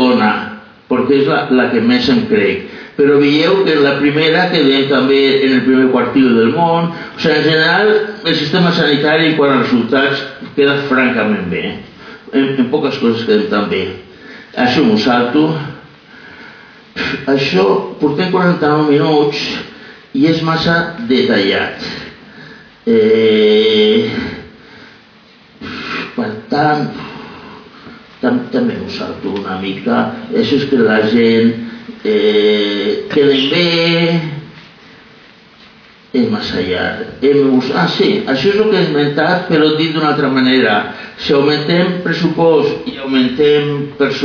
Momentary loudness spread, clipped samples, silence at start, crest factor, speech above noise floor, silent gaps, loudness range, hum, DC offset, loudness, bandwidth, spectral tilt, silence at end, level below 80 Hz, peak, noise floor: 12 LU; under 0.1%; 0 s; 12 dB; 31 dB; none; 7 LU; none; under 0.1%; -13 LUFS; 5.4 kHz; -6.5 dB/octave; 0 s; -50 dBFS; -2 dBFS; -43 dBFS